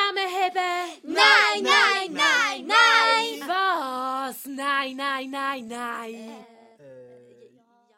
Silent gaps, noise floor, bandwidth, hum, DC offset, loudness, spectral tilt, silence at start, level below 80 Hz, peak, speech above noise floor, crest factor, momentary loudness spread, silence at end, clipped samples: none; -60 dBFS; 16 kHz; none; under 0.1%; -21 LUFS; -0.5 dB/octave; 0 s; -82 dBFS; -4 dBFS; 29 dB; 20 dB; 16 LU; 0.9 s; under 0.1%